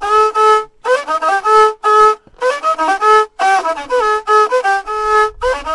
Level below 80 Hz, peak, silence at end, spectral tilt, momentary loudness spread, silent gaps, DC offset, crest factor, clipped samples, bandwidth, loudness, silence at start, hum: -42 dBFS; 0 dBFS; 0 s; -1.5 dB/octave; 7 LU; none; under 0.1%; 12 dB; under 0.1%; 11.5 kHz; -12 LUFS; 0 s; none